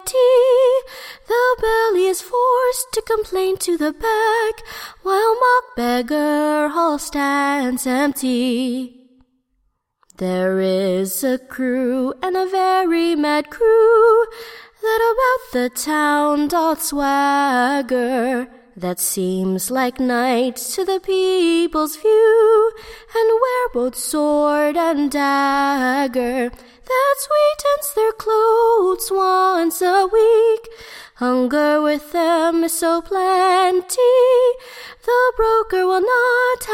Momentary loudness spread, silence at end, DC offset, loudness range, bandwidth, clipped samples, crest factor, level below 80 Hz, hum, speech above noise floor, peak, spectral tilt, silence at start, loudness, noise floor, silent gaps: 8 LU; 0 s; under 0.1%; 4 LU; 16.5 kHz; under 0.1%; 14 dB; -48 dBFS; none; 50 dB; -4 dBFS; -3.5 dB/octave; 0 s; -17 LUFS; -67 dBFS; none